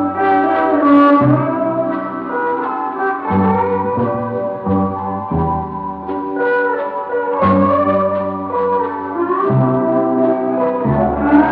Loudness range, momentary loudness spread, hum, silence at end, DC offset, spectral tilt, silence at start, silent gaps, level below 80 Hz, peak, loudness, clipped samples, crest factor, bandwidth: 4 LU; 8 LU; none; 0 s; under 0.1%; -11 dB/octave; 0 s; none; -40 dBFS; 0 dBFS; -16 LUFS; under 0.1%; 14 dB; 4.8 kHz